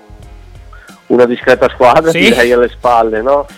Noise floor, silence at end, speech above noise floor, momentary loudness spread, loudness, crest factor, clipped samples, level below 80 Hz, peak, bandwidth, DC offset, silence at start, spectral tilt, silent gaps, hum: -35 dBFS; 0.05 s; 26 dB; 4 LU; -9 LUFS; 10 dB; under 0.1%; -34 dBFS; 0 dBFS; 16.5 kHz; under 0.1%; 0.1 s; -4.5 dB/octave; none; none